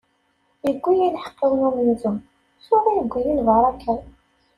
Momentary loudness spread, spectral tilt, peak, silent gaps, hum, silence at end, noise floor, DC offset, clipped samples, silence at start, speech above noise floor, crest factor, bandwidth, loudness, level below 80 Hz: 9 LU; -8 dB/octave; -6 dBFS; none; none; 0.5 s; -66 dBFS; under 0.1%; under 0.1%; 0.65 s; 46 dB; 16 dB; 11.5 kHz; -21 LUFS; -48 dBFS